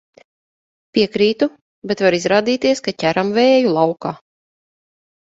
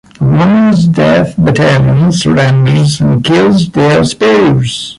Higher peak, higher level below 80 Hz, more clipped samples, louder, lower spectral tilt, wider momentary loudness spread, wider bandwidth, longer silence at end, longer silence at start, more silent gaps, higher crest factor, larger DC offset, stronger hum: about the same, 0 dBFS vs 0 dBFS; second, -58 dBFS vs -36 dBFS; neither; second, -17 LUFS vs -8 LUFS; second, -5 dB/octave vs -6.5 dB/octave; first, 12 LU vs 2 LU; second, 7.8 kHz vs 11.5 kHz; first, 1.05 s vs 0.05 s; first, 0.95 s vs 0.2 s; first, 1.61-1.82 s vs none; first, 18 dB vs 8 dB; neither; neither